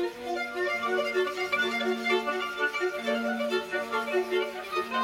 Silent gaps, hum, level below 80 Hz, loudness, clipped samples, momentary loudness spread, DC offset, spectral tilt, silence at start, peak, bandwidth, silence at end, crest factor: none; none; -70 dBFS; -29 LUFS; under 0.1%; 4 LU; under 0.1%; -3 dB/octave; 0 s; -14 dBFS; 16.5 kHz; 0 s; 14 dB